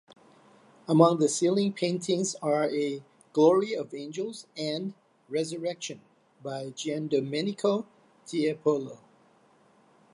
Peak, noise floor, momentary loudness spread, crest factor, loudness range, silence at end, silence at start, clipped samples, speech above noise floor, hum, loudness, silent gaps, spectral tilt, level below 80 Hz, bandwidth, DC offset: -6 dBFS; -62 dBFS; 16 LU; 22 dB; 8 LU; 1.15 s; 0.9 s; under 0.1%; 35 dB; none; -28 LUFS; none; -5 dB/octave; -80 dBFS; 11.5 kHz; under 0.1%